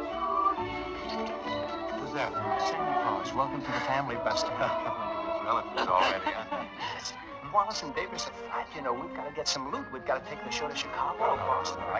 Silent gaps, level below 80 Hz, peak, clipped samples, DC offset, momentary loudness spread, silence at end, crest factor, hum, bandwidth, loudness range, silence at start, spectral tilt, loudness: none; -56 dBFS; -12 dBFS; under 0.1%; under 0.1%; 8 LU; 0 s; 20 dB; none; 8 kHz; 4 LU; 0 s; -3.5 dB/octave; -31 LUFS